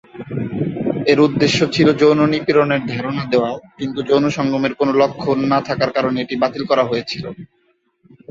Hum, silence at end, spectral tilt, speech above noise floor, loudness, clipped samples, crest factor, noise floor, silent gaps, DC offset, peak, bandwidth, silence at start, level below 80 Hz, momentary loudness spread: none; 0.85 s; -6 dB/octave; 42 dB; -17 LUFS; under 0.1%; 16 dB; -59 dBFS; none; under 0.1%; -2 dBFS; 8 kHz; 0.15 s; -52 dBFS; 12 LU